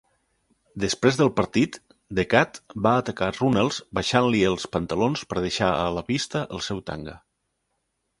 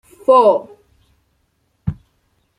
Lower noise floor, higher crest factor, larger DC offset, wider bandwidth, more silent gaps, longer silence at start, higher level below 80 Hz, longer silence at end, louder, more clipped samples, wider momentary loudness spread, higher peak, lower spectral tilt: first, -76 dBFS vs -65 dBFS; first, 24 dB vs 16 dB; neither; about the same, 11.5 kHz vs 10.5 kHz; neither; first, 0.75 s vs 0.3 s; about the same, -50 dBFS vs -46 dBFS; first, 1.05 s vs 0.65 s; second, -24 LUFS vs -15 LUFS; neither; second, 10 LU vs 17 LU; about the same, 0 dBFS vs -2 dBFS; second, -5 dB/octave vs -7.5 dB/octave